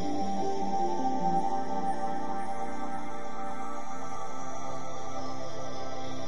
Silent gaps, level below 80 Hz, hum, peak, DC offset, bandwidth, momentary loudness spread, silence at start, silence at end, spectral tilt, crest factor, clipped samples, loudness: none; -62 dBFS; none; -16 dBFS; 4%; 11 kHz; 9 LU; 0 s; 0 s; -5.5 dB/octave; 16 dB; under 0.1%; -35 LUFS